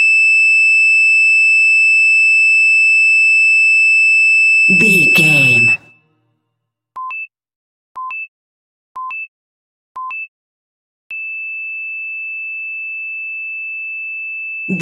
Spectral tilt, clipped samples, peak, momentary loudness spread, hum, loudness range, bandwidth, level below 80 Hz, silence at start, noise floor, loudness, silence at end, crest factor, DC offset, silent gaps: -2.5 dB/octave; under 0.1%; 0 dBFS; 18 LU; none; 21 LU; 15 kHz; -68 dBFS; 0 s; -74 dBFS; -7 LUFS; 0 s; 14 dB; under 0.1%; 7.56-7.95 s, 8.28-8.95 s, 9.28-9.95 s, 10.28-11.10 s